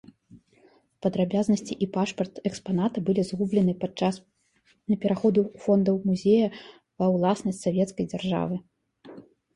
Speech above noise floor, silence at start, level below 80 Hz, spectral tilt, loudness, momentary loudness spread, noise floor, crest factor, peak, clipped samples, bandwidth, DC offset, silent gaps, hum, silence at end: 41 dB; 0.35 s; -62 dBFS; -7 dB/octave; -26 LUFS; 8 LU; -66 dBFS; 18 dB; -10 dBFS; under 0.1%; 11.5 kHz; under 0.1%; none; none; 0.35 s